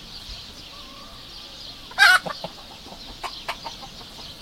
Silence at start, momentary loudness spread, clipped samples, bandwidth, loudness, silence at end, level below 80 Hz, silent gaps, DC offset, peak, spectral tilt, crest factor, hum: 0 s; 24 LU; under 0.1%; 16.5 kHz; -21 LUFS; 0 s; -50 dBFS; none; under 0.1%; -2 dBFS; -0.5 dB/octave; 24 dB; none